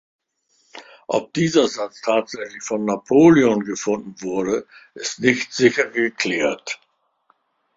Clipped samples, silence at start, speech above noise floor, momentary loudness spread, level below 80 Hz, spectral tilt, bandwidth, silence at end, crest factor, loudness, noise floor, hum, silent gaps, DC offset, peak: under 0.1%; 0.75 s; 45 dB; 15 LU; -60 dBFS; -4.5 dB/octave; 7.8 kHz; 1 s; 20 dB; -20 LUFS; -65 dBFS; none; none; under 0.1%; -2 dBFS